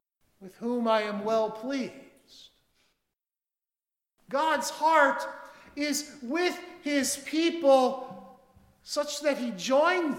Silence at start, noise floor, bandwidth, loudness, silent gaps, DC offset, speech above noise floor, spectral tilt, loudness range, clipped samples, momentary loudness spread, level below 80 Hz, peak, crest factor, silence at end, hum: 0.4 s; under -90 dBFS; 17.5 kHz; -27 LUFS; none; under 0.1%; over 63 dB; -2.5 dB/octave; 8 LU; under 0.1%; 16 LU; -72 dBFS; -8 dBFS; 22 dB; 0 s; none